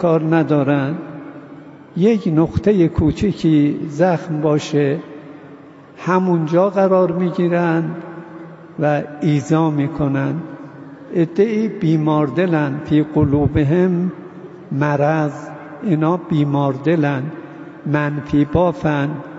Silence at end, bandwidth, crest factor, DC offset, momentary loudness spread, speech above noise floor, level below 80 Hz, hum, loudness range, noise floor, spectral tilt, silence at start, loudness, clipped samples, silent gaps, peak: 0 s; 8 kHz; 14 dB; under 0.1%; 18 LU; 24 dB; -42 dBFS; none; 2 LU; -40 dBFS; -8.5 dB/octave; 0 s; -17 LUFS; under 0.1%; none; -4 dBFS